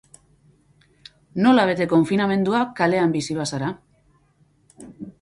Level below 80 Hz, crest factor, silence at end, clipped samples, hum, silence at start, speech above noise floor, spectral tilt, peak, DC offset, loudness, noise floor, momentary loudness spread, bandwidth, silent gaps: -60 dBFS; 18 dB; 0.1 s; under 0.1%; none; 1.35 s; 41 dB; -6 dB/octave; -4 dBFS; under 0.1%; -20 LUFS; -60 dBFS; 17 LU; 11.5 kHz; none